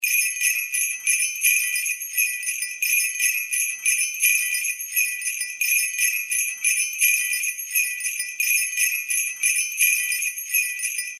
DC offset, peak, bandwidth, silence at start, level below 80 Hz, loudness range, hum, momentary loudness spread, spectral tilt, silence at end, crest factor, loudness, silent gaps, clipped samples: under 0.1%; -6 dBFS; 16 kHz; 0 s; -88 dBFS; 0 LU; none; 5 LU; 9 dB/octave; 0 s; 18 dB; -20 LUFS; none; under 0.1%